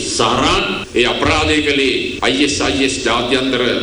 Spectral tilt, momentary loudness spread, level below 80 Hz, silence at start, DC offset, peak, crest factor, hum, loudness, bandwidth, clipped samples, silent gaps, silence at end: -3.5 dB/octave; 3 LU; -34 dBFS; 0 s; under 0.1%; 0 dBFS; 16 dB; none; -14 LUFS; over 20 kHz; under 0.1%; none; 0 s